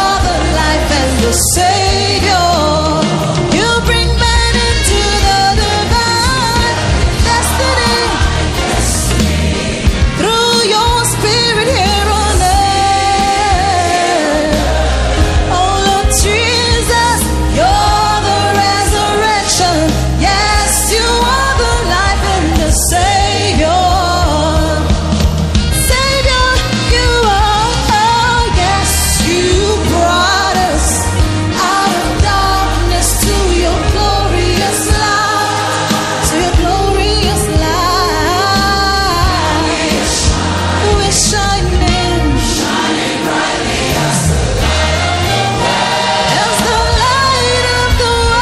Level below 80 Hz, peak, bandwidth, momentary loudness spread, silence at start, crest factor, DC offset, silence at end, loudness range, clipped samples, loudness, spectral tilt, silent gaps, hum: -18 dBFS; 0 dBFS; 14 kHz; 3 LU; 0 s; 12 dB; under 0.1%; 0 s; 1 LU; under 0.1%; -11 LUFS; -3.5 dB/octave; none; none